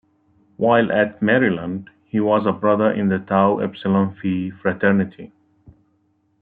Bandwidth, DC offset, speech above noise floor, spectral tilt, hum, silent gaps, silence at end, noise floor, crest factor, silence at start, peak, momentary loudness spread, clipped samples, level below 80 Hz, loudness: 4.1 kHz; under 0.1%; 45 dB; -11 dB/octave; none; none; 1.15 s; -64 dBFS; 16 dB; 0.6 s; -4 dBFS; 8 LU; under 0.1%; -62 dBFS; -19 LUFS